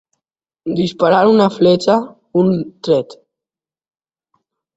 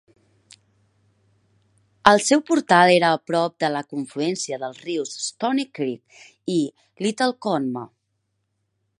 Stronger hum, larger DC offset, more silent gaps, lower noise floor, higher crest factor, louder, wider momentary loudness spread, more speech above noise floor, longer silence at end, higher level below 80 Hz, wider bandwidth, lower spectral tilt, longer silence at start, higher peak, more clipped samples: neither; neither; neither; first, -89 dBFS vs -74 dBFS; second, 16 dB vs 24 dB; first, -15 LUFS vs -21 LUFS; second, 10 LU vs 15 LU; first, 75 dB vs 52 dB; first, 1.6 s vs 1.15 s; first, -56 dBFS vs -64 dBFS; second, 8 kHz vs 11.5 kHz; first, -7 dB/octave vs -4 dB/octave; second, 0.65 s vs 2.05 s; about the same, 0 dBFS vs 0 dBFS; neither